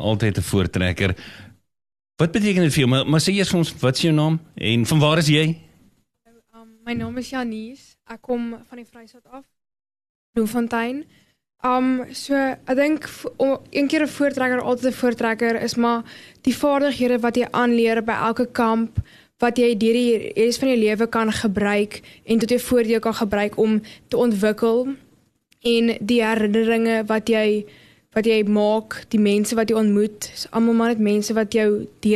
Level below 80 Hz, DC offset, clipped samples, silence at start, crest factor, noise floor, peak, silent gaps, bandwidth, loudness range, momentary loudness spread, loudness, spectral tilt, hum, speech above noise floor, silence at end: -48 dBFS; under 0.1%; under 0.1%; 0 s; 18 dB; -60 dBFS; -4 dBFS; 10.09-10.33 s; 13 kHz; 8 LU; 9 LU; -20 LUFS; -5.5 dB/octave; none; 40 dB; 0 s